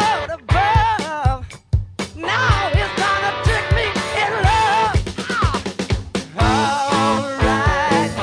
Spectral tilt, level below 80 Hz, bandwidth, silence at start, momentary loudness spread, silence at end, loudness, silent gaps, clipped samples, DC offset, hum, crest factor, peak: -5 dB/octave; -28 dBFS; 10.5 kHz; 0 s; 8 LU; 0 s; -18 LUFS; none; under 0.1%; under 0.1%; none; 16 dB; -2 dBFS